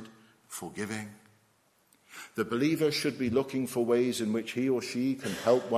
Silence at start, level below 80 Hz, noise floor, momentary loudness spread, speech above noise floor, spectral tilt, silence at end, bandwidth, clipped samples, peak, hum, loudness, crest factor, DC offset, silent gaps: 0 s; -66 dBFS; -68 dBFS; 14 LU; 39 dB; -5 dB/octave; 0 s; 15.5 kHz; under 0.1%; -12 dBFS; none; -30 LUFS; 18 dB; under 0.1%; none